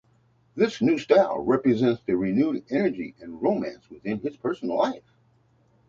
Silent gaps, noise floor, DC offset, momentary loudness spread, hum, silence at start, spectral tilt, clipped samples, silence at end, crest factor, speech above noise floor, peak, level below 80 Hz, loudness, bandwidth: none; -63 dBFS; under 0.1%; 15 LU; none; 0.55 s; -7 dB/octave; under 0.1%; 0.9 s; 20 dB; 39 dB; -6 dBFS; -62 dBFS; -25 LUFS; 7.4 kHz